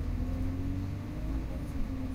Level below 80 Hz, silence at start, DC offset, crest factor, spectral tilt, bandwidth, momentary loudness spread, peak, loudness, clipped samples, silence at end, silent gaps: -36 dBFS; 0 s; under 0.1%; 12 dB; -8 dB/octave; 15.5 kHz; 3 LU; -22 dBFS; -37 LUFS; under 0.1%; 0 s; none